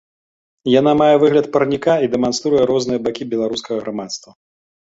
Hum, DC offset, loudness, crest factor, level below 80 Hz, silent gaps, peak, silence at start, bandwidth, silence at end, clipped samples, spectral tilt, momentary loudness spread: none; under 0.1%; -16 LUFS; 16 dB; -54 dBFS; none; -2 dBFS; 0.65 s; 8 kHz; 0.7 s; under 0.1%; -5.5 dB/octave; 13 LU